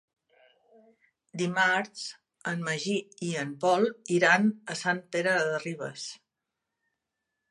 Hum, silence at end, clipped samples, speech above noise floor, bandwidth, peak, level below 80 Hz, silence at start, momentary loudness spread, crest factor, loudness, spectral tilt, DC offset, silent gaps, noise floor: none; 1.35 s; under 0.1%; 58 dB; 11.5 kHz; -8 dBFS; -80 dBFS; 1.35 s; 15 LU; 22 dB; -28 LUFS; -4.5 dB/octave; under 0.1%; none; -86 dBFS